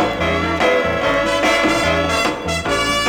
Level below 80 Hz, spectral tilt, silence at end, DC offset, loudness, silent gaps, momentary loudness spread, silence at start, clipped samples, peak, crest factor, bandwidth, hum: -36 dBFS; -4 dB/octave; 0 s; under 0.1%; -16 LUFS; none; 4 LU; 0 s; under 0.1%; -4 dBFS; 14 dB; over 20 kHz; none